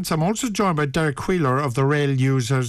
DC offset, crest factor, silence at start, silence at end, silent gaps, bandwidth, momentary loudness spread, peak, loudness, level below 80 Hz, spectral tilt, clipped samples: under 0.1%; 10 dB; 0 s; 0 s; none; 14 kHz; 2 LU; -10 dBFS; -21 LUFS; -46 dBFS; -6 dB/octave; under 0.1%